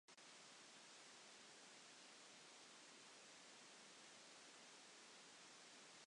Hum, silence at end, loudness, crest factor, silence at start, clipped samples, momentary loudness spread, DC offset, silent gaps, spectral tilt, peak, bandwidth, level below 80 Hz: none; 0 s; -62 LUFS; 14 dB; 0.1 s; under 0.1%; 0 LU; under 0.1%; none; -0.5 dB/octave; -52 dBFS; 11 kHz; under -90 dBFS